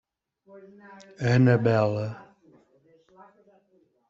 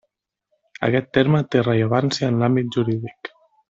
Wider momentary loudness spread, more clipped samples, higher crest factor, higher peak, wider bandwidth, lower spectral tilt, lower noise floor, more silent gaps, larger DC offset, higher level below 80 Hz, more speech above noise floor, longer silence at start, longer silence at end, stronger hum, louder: first, 15 LU vs 11 LU; neither; about the same, 20 dB vs 18 dB; second, -8 dBFS vs -4 dBFS; about the same, 7.4 kHz vs 7.8 kHz; about the same, -8 dB/octave vs -7 dB/octave; second, -66 dBFS vs -74 dBFS; neither; neither; about the same, -62 dBFS vs -58 dBFS; second, 42 dB vs 55 dB; second, 0.55 s vs 0.8 s; first, 1.85 s vs 0.4 s; neither; second, -23 LUFS vs -20 LUFS